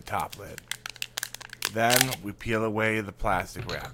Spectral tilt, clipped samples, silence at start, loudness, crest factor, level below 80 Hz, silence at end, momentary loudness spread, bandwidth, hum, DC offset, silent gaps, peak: -3 dB/octave; under 0.1%; 0 s; -28 LUFS; 28 dB; -46 dBFS; 0 s; 14 LU; 17 kHz; none; under 0.1%; none; -2 dBFS